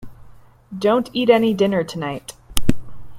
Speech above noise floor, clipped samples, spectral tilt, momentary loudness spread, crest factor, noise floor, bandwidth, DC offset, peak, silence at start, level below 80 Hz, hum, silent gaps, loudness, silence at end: 27 dB; under 0.1%; -5.5 dB/octave; 16 LU; 18 dB; -46 dBFS; 16.5 kHz; under 0.1%; 0 dBFS; 0 s; -36 dBFS; none; none; -20 LUFS; 0 s